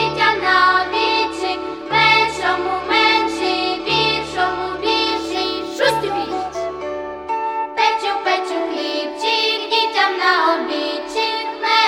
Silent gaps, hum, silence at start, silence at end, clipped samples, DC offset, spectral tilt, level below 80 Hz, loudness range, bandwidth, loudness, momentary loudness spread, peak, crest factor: none; none; 0 s; 0 s; under 0.1%; under 0.1%; -3 dB/octave; -50 dBFS; 5 LU; 18.5 kHz; -18 LUFS; 9 LU; -2 dBFS; 18 dB